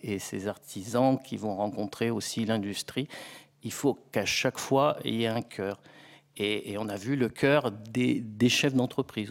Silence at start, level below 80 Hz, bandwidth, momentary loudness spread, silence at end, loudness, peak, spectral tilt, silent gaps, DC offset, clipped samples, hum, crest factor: 0.05 s; -66 dBFS; 16.5 kHz; 11 LU; 0 s; -29 LUFS; -10 dBFS; -4.5 dB/octave; none; under 0.1%; under 0.1%; none; 20 dB